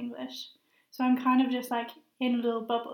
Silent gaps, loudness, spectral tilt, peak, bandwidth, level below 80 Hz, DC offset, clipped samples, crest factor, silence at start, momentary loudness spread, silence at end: none; -29 LUFS; -4.5 dB/octave; -14 dBFS; 18 kHz; -88 dBFS; under 0.1%; under 0.1%; 16 dB; 0 s; 17 LU; 0 s